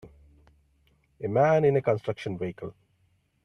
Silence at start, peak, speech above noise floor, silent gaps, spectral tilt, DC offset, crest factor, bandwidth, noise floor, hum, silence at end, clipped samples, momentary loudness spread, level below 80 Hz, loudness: 0.05 s; -10 dBFS; 43 dB; none; -8 dB/octave; under 0.1%; 18 dB; 10.5 kHz; -69 dBFS; none; 0.75 s; under 0.1%; 17 LU; -62 dBFS; -26 LUFS